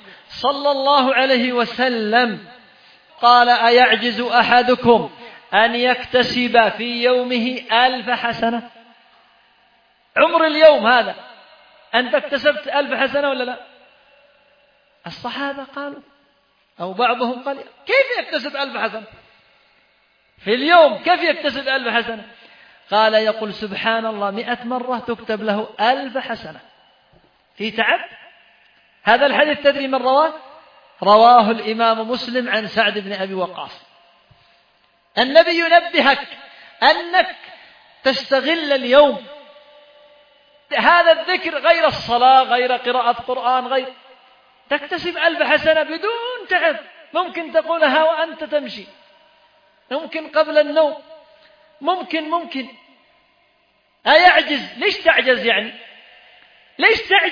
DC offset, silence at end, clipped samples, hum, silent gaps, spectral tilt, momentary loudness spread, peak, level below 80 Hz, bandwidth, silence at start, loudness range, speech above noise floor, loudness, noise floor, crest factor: under 0.1%; 0 s; under 0.1%; none; none; -5 dB/octave; 16 LU; 0 dBFS; -60 dBFS; 5.2 kHz; 0.3 s; 7 LU; 44 dB; -16 LUFS; -61 dBFS; 18 dB